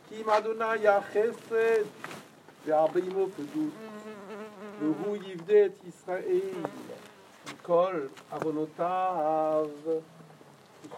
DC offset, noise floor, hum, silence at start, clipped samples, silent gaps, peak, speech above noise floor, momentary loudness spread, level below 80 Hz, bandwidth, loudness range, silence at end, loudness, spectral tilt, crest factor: under 0.1%; -54 dBFS; none; 0.1 s; under 0.1%; none; -12 dBFS; 26 dB; 18 LU; -86 dBFS; 14.5 kHz; 4 LU; 0 s; -29 LUFS; -6 dB/octave; 18 dB